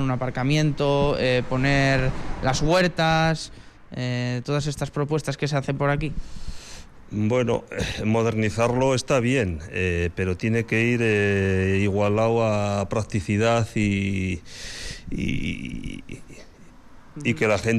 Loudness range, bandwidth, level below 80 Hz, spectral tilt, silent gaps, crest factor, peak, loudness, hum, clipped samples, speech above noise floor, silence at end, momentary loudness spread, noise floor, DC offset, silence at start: 5 LU; 13 kHz; -40 dBFS; -6 dB/octave; none; 12 dB; -10 dBFS; -23 LUFS; none; under 0.1%; 23 dB; 0 s; 13 LU; -45 dBFS; under 0.1%; 0 s